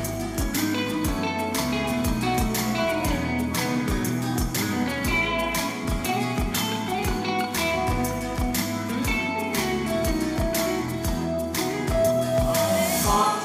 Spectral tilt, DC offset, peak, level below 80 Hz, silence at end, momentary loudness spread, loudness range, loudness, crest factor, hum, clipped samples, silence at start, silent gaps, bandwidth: -4.5 dB/octave; under 0.1%; -8 dBFS; -36 dBFS; 0 s; 5 LU; 1 LU; -25 LUFS; 16 dB; none; under 0.1%; 0 s; none; 16 kHz